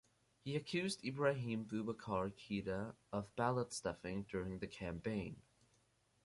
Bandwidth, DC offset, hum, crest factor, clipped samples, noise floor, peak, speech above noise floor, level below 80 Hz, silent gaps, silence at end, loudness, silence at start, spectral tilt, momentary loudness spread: 11.5 kHz; under 0.1%; none; 20 dB; under 0.1%; -77 dBFS; -22 dBFS; 35 dB; -66 dBFS; none; 0.85 s; -43 LUFS; 0.45 s; -5.5 dB/octave; 8 LU